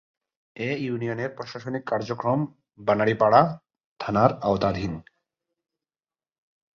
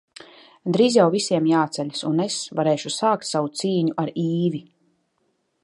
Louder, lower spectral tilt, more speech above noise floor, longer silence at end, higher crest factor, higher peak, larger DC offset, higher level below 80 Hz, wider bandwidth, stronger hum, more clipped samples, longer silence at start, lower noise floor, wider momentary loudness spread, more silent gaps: about the same, -24 LUFS vs -22 LUFS; first, -7.5 dB/octave vs -5.5 dB/octave; first, over 66 dB vs 49 dB; first, 1.75 s vs 1 s; about the same, 22 dB vs 20 dB; about the same, -4 dBFS vs -4 dBFS; neither; first, -54 dBFS vs -72 dBFS; second, 7 kHz vs 11.5 kHz; neither; neither; about the same, 0.55 s vs 0.65 s; first, under -90 dBFS vs -70 dBFS; first, 15 LU vs 7 LU; first, 3.85-3.96 s vs none